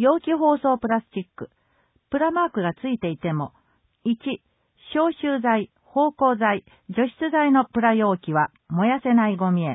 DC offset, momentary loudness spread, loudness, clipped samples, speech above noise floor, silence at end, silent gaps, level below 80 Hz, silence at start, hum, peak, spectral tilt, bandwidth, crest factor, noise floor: under 0.1%; 11 LU; -22 LUFS; under 0.1%; 44 dB; 0 s; none; -62 dBFS; 0 s; none; -6 dBFS; -11.5 dB/octave; 4 kHz; 16 dB; -66 dBFS